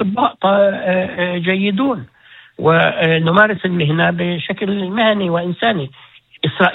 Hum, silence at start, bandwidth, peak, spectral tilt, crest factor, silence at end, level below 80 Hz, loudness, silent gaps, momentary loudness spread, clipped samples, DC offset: none; 0 s; 4.2 kHz; 0 dBFS; -8.5 dB/octave; 16 dB; 0 s; -56 dBFS; -16 LUFS; none; 7 LU; under 0.1%; under 0.1%